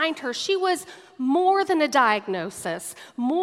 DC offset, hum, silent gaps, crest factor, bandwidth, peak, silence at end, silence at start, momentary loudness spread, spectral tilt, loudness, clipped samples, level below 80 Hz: under 0.1%; none; none; 18 dB; 15 kHz; -6 dBFS; 0 s; 0 s; 11 LU; -3 dB/octave; -23 LUFS; under 0.1%; -76 dBFS